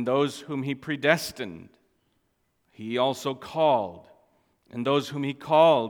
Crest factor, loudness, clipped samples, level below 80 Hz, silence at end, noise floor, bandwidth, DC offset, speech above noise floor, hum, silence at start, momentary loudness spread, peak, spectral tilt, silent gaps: 22 dB; -26 LUFS; under 0.1%; -68 dBFS; 0 s; -72 dBFS; 18 kHz; under 0.1%; 47 dB; none; 0 s; 14 LU; -4 dBFS; -5 dB/octave; none